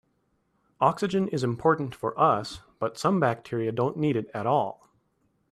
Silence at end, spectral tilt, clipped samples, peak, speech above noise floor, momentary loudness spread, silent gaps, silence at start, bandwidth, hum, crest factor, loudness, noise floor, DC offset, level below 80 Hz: 0.75 s; -7 dB/octave; under 0.1%; -6 dBFS; 46 dB; 8 LU; none; 0.8 s; 14 kHz; none; 20 dB; -26 LUFS; -72 dBFS; under 0.1%; -62 dBFS